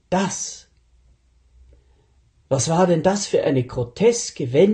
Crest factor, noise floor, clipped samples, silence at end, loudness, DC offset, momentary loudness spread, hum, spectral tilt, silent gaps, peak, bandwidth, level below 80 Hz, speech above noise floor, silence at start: 18 dB; -58 dBFS; under 0.1%; 0 s; -20 LUFS; under 0.1%; 10 LU; none; -5 dB/octave; none; -4 dBFS; 10 kHz; -52 dBFS; 39 dB; 0.1 s